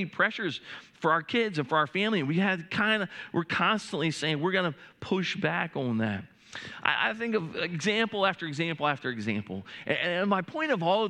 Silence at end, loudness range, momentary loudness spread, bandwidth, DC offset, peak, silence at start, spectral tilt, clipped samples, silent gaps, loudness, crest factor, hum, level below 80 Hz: 0 s; 2 LU; 8 LU; 11 kHz; under 0.1%; -6 dBFS; 0 s; -5 dB/octave; under 0.1%; none; -28 LUFS; 24 dB; none; -72 dBFS